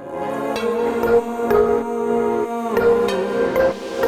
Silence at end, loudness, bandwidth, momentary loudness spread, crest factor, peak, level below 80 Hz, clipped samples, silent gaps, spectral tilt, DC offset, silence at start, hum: 0 s; -19 LUFS; 15 kHz; 6 LU; 14 dB; -6 dBFS; -46 dBFS; under 0.1%; none; -5.5 dB/octave; under 0.1%; 0 s; none